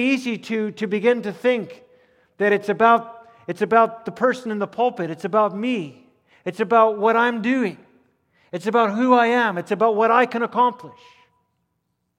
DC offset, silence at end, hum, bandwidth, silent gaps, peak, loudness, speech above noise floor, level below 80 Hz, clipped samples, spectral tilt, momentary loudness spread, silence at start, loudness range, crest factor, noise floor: under 0.1%; 1.3 s; none; 12 kHz; none; -2 dBFS; -20 LUFS; 54 dB; -74 dBFS; under 0.1%; -6 dB/octave; 12 LU; 0 s; 2 LU; 20 dB; -73 dBFS